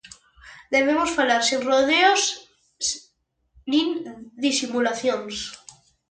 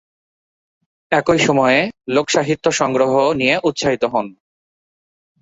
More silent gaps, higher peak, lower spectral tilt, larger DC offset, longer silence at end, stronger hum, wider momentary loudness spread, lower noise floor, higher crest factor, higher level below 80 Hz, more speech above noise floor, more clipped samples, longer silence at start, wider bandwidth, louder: neither; about the same, -4 dBFS vs -2 dBFS; second, -1 dB/octave vs -4 dB/octave; neither; second, 0.55 s vs 1.1 s; neither; first, 16 LU vs 6 LU; second, -68 dBFS vs under -90 dBFS; about the same, 18 dB vs 16 dB; second, -60 dBFS vs -52 dBFS; second, 46 dB vs over 74 dB; neither; second, 0.45 s vs 1.1 s; first, 9.4 kHz vs 8 kHz; second, -22 LUFS vs -16 LUFS